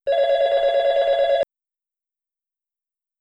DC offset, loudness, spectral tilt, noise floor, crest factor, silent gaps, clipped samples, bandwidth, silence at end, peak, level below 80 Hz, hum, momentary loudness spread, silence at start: under 0.1%; -19 LUFS; -2 dB/octave; -87 dBFS; 12 dB; none; under 0.1%; 7.6 kHz; 1.75 s; -10 dBFS; -58 dBFS; none; 4 LU; 0.05 s